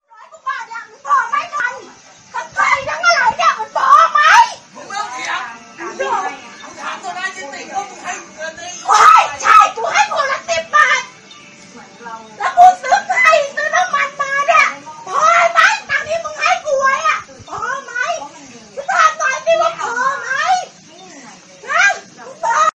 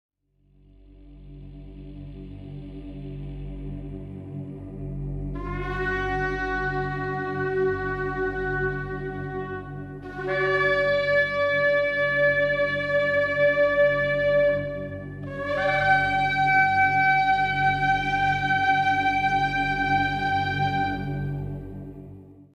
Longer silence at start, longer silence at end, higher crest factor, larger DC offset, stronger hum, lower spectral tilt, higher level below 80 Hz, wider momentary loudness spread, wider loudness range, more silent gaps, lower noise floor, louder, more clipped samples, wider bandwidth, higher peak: second, 0.35 s vs 0.95 s; about the same, 0.05 s vs 0.15 s; about the same, 16 dB vs 16 dB; neither; second, none vs 50 Hz at -55 dBFS; second, -0.5 dB/octave vs -6.5 dB/octave; second, -58 dBFS vs -42 dBFS; about the same, 19 LU vs 18 LU; second, 6 LU vs 16 LU; neither; second, -41 dBFS vs -62 dBFS; first, -14 LUFS vs -23 LUFS; first, 0.2% vs under 0.1%; first, 12.5 kHz vs 9 kHz; first, 0 dBFS vs -8 dBFS